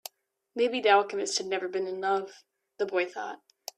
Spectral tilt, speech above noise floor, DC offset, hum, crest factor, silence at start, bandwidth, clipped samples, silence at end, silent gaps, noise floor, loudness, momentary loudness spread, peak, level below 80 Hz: -2 dB/octave; 21 dB; under 0.1%; none; 22 dB; 0.55 s; 14.5 kHz; under 0.1%; 0.4 s; none; -49 dBFS; -28 LUFS; 18 LU; -8 dBFS; -82 dBFS